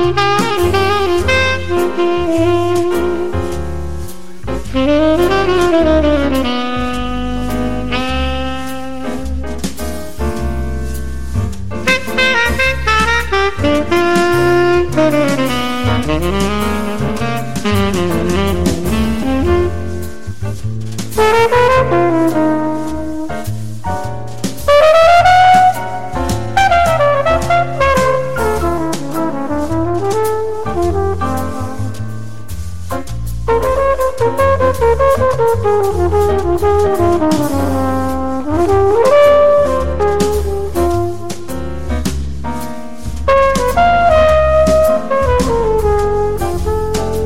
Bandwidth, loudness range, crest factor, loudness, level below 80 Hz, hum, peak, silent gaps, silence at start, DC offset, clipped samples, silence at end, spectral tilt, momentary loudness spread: 16.5 kHz; 7 LU; 12 dB; -14 LUFS; -26 dBFS; none; -2 dBFS; none; 0 s; 7%; under 0.1%; 0 s; -5.5 dB/octave; 13 LU